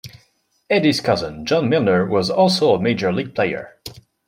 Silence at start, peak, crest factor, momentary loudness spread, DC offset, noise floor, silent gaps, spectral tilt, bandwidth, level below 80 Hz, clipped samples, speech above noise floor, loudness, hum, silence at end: 0.05 s; -4 dBFS; 16 dB; 11 LU; under 0.1%; -61 dBFS; none; -5.5 dB/octave; 16 kHz; -54 dBFS; under 0.1%; 43 dB; -18 LUFS; none; 0.35 s